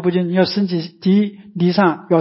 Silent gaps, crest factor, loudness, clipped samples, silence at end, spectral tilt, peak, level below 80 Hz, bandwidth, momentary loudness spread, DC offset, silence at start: none; 14 dB; -17 LUFS; under 0.1%; 0 s; -11 dB/octave; -2 dBFS; -60 dBFS; 5.8 kHz; 6 LU; under 0.1%; 0 s